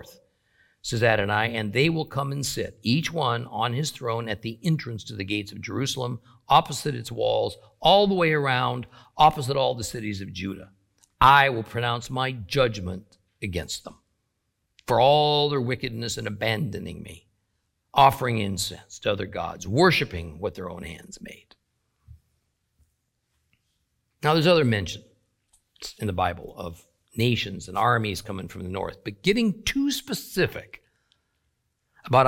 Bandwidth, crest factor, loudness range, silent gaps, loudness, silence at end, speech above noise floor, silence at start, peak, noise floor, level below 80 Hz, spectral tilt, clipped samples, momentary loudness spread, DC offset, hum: 16.5 kHz; 22 dB; 5 LU; none; -24 LUFS; 0 s; 51 dB; 0.85 s; -4 dBFS; -76 dBFS; -50 dBFS; -5 dB/octave; under 0.1%; 17 LU; under 0.1%; none